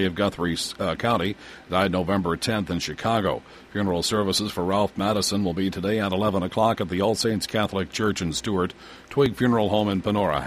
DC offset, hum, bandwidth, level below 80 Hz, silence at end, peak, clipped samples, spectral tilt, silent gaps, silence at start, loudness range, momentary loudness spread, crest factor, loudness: under 0.1%; none; 15.5 kHz; -50 dBFS; 0 s; -6 dBFS; under 0.1%; -5 dB/octave; none; 0 s; 1 LU; 5 LU; 18 dB; -24 LUFS